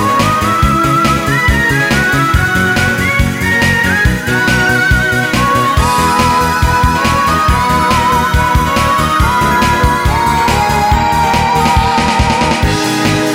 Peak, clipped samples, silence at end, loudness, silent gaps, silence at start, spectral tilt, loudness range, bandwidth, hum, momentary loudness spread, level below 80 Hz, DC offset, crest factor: 0 dBFS; under 0.1%; 0 s; -11 LUFS; none; 0 s; -4.5 dB/octave; 0 LU; over 20 kHz; none; 2 LU; -20 dBFS; under 0.1%; 10 dB